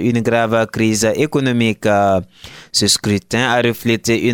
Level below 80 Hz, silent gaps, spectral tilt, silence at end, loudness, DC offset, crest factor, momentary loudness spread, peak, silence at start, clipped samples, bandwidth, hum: -48 dBFS; none; -4 dB/octave; 0 s; -15 LUFS; under 0.1%; 14 dB; 4 LU; -2 dBFS; 0 s; under 0.1%; 17.5 kHz; none